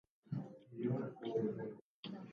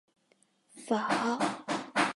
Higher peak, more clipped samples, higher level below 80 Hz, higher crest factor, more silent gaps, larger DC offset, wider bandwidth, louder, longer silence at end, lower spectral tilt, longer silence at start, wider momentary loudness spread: second, -26 dBFS vs -14 dBFS; neither; about the same, -80 dBFS vs -82 dBFS; about the same, 16 dB vs 20 dB; first, 1.81-2.03 s vs none; neither; second, 6.8 kHz vs 11.5 kHz; second, -44 LUFS vs -31 LUFS; about the same, 0 s vs 0.05 s; first, -7.5 dB/octave vs -3.5 dB/octave; second, 0.25 s vs 0.75 s; first, 12 LU vs 7 LU